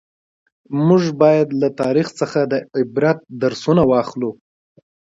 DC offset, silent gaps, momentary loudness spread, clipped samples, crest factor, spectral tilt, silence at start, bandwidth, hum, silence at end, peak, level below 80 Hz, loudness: under 0.1%; none; 8 LU; under 0.1%; 18 dB; -7.5 dB/octave; 0.7 s; 8 kHz; none; 0.8 s; 0 dBFS; -54 dBFS; -17 LUFS